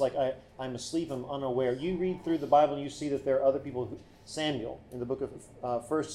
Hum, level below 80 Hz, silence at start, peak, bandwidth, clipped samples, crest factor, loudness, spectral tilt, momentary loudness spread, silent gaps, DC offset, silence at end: none; -60 dBFS; 0 s; -12 dBFS; 12.5 kHz; under 0.1%; 18 dB; -31 LUFS; -5.5 dB/octave; 14 LU; none; under 0.1%; 0 s